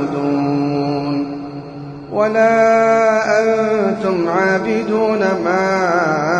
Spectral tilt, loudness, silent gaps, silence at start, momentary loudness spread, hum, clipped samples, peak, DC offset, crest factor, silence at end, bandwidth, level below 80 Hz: -6 dB/octave; -15 LUFS; none; 0 s; 12 LU; none; under 0.1%; -4 dBFS; under 0.1%; 12 dB; 0 s; 10 kHz; -52 dBFS